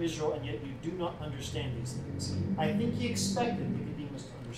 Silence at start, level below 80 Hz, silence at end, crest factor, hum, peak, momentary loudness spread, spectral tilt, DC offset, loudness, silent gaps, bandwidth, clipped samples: 0 s; -54 dBFS; 0 s; 16 dB; none; -18 dBFS; 8 LU; -5.5 dB/octave; under 0.1%; -34 LUFS; none; 15.5 kHz; under 0.1%